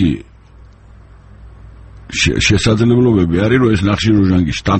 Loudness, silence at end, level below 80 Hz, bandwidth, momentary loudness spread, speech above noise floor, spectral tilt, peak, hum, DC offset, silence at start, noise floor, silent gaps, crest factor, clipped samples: -13 LUFS; 0 s; -32 dBFS; 8.8 kHz; 5 LU; 29 dB; -5.5 dB/octave; 0 dBFS; none; under 0.1%; 0 s; -41 dBFS; none; 14 dB; under 0.1%